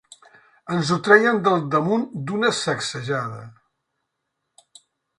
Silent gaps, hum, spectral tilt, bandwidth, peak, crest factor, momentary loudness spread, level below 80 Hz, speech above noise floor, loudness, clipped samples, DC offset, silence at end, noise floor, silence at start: none; none; -5 dB/octave; 11 kHz; 0 dBFS; 22 dB; 13 LU; -64 dBFS; 57 dB; -20 LUFS; under 0.1%; under 0.1%; 1.7 s; -78 dBFS; 0.65 s